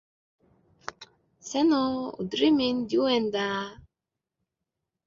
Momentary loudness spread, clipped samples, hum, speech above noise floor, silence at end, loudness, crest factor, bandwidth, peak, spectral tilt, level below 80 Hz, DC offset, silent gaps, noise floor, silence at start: 19 LU; under 0.1%; none; 62 dB; 1.3 s; -26 LUFS; 18 dB; 7.6 kHz; -10 dBFS; -4.5 dB/octave; -64 dBFS; under 0.1%; none; -87 dBFS; 0.85 s